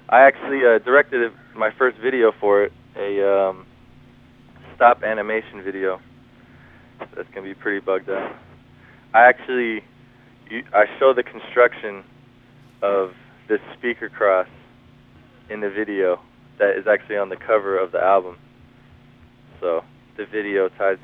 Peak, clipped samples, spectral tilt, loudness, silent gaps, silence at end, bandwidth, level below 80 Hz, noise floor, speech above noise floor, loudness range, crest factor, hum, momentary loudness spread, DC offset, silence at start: 0 dBFS; under 0.1%; -7.5 dB/octave; -20 LUFS; none; 0.1 s; 4.2 kHz; -60 dBFS; -50 dBFS; 30 dB; 6 LU; 20 dB; none; 18 LU; under 0.1%; 0.1 s